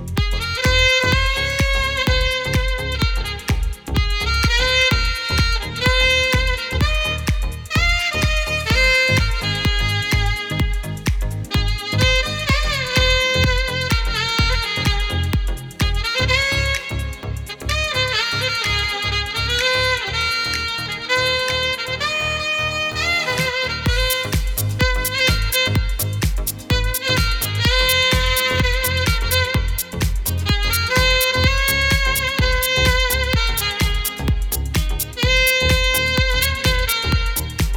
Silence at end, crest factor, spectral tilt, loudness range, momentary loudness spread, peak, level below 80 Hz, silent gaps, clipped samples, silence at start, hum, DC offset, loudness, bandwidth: 0 s; 16 dB; -3.5 dB/octave; 2 LU; 7 LU; -2 dBFS; -24 dBFS; none; under 0.1%; 0 s; none; under 0.1%; -18 LUFS; 19.5 kHz